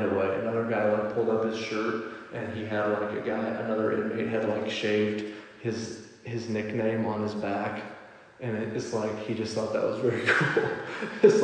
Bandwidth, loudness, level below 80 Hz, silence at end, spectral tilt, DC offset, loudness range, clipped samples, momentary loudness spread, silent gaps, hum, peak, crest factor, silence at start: 9.8 kHz; -29 LUFS; -70 dBFS; 0 s; -6 dB/octave; under 0.1%; 3 LU; under 0.1%; 11 LU; none; none; -6 dBFS; 22 dB; 0 s